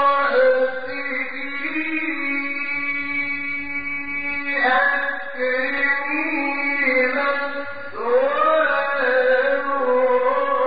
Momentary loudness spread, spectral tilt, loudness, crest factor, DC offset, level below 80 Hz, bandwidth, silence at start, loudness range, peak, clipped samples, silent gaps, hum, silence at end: 8 LU; -0.5 dB/octave; -20 LUFS; 14 dB; 2%; -60 dBFS; 5 kHz; 0 s; 4 LU; -6 dBFS; under 0.1%; none; none; 0 s